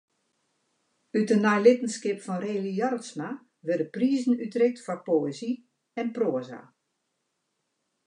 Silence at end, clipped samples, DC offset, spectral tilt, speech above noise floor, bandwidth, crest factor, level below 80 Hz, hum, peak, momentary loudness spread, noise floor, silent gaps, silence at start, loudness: 1.45 s; under 0.1%; under 0.1%; -6 dB/octave; 53 dB; 10.5 kHz; 22 dB; -88 dBFS; none; -6 dBFS; 15 LU; -79 dBFS; none; 1.15 s; -27 LUFS